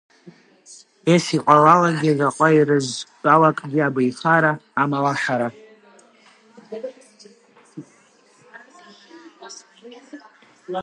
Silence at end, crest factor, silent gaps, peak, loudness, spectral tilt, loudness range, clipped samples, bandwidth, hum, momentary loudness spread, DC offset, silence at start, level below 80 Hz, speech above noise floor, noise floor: 0 s; 20 dB; none; 0 dBFS; -18 LUFS; -5.5 dB/octave; 19 LU; under 0.1%; 11.5 kHz; none; 22 LU; under 0.1%; 0.25 s; -70 dBFS; 37 dB; -55 dBFS